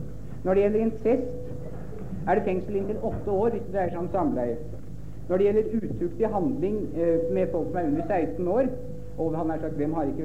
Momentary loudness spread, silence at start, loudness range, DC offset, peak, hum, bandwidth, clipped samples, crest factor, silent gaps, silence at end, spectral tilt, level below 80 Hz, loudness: 14 LU; 0 s; 2 LU; 2%; -10 dBFS; none; 9.4 kHz; under 0.1%; 16 dB; none; 0 s; -9.5 dB/octave; -44 dBFS; -27 LUFS